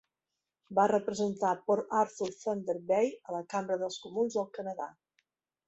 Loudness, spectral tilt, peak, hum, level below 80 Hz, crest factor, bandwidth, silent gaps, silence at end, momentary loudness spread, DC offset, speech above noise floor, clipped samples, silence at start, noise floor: -32 LUFS; -5 dB/octave; -14 dBFS; none; -76 dBFS; 18 dB; 8.2 kHz; none; 0.75 s; 10 LU; under 0.1%; 57 dB; under 0.1%; 0.7 s; -89 dBFS